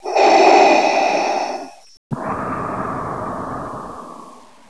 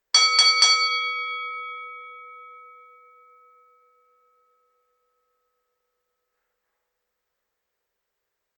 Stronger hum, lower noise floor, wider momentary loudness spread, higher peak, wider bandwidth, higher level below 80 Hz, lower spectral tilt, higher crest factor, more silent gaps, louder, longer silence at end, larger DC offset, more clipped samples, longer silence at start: neither; second, -41 dBFS vs -81 dBFS; second, 21 LU vs 25 LU; first, 0 dBFS vs -4 dBFS; first, 11 kHz vs 9.6 kHz; first, -50 dBFS vs under -90 dBFS; first, -4 dB/octave vs 6.5 dB/octave; second, 18 dB vs 24 dB; first, 1.97-2.10 s vs none; about the same, -16 LUFS vs -18 LUFS; second, 0.35 s vs 6 s; first, 0.4% vs under 0.1%; neither; second, 0 s vs 0.15 s